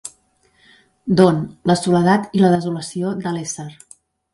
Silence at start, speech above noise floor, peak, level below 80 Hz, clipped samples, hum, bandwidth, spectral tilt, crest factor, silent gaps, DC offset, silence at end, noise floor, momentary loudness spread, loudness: 0.05 s; 42 dB; 0 dBFS; -56 dBFS; under 0.1%; none; 11.5 kHz; -6 dB/octave; 18 dB; none; under 0.1%; 0.6 s; -59 dBFS; 16 LU; -18 LUFS